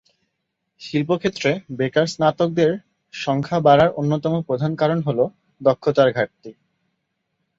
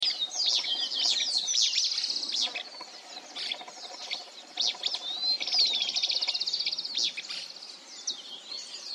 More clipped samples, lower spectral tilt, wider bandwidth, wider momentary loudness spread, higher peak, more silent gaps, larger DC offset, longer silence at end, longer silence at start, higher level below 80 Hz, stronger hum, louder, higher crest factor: neither; first, -6.5 dB/octave vs 3 dB/octave; second, 7.8 kHz vs 15 kHz; second, 10 LU vs 16 LU; first, -2 dBFS vs -12 dBFS; neither; neither; first, 1.05 s vs 0 s; first, 0.8 s vs 0 s; first, -56 dBFS vs -88 dBFS; neither; first, -20 LUFS vs -27 LUFS; about the same, 18 dB vs 18 dB